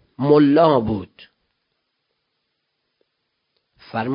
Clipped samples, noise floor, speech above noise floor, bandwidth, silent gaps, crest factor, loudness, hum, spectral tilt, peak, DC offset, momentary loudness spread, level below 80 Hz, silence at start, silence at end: under 0.1%; -74 dBFS; 58 dB; 5.4 kHz; none; 20 dB; -17 LUFS; none; -12 dB/octave; -2 dBFS; under 0.1%; 15 LU; -52 dBFS; 0.2 s; 0 s